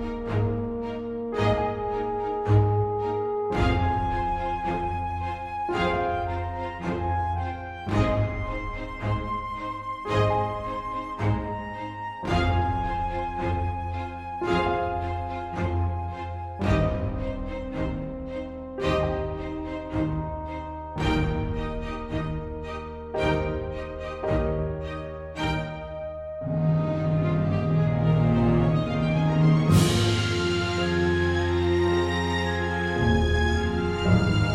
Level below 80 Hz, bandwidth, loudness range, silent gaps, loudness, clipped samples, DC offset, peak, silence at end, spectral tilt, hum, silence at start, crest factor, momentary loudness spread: -36 dBFS; 13.5 kHz; 7 LU; none; -27 LUFS; under 0.1%; under 0.1%; -8 dBFS; 0 s; -7 dB/octave; none; 0 s; 18 dB; 11 LU